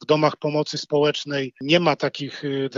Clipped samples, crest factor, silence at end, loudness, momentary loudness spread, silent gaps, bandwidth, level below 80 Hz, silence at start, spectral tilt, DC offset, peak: under 0.1%; 18 dB; 0 s; -22 LUFS; 9 LU; none; 7.6 kHz; -72 dBFS; 0 s; -5.5 dB/octave; under 0.1%; -4 dBFS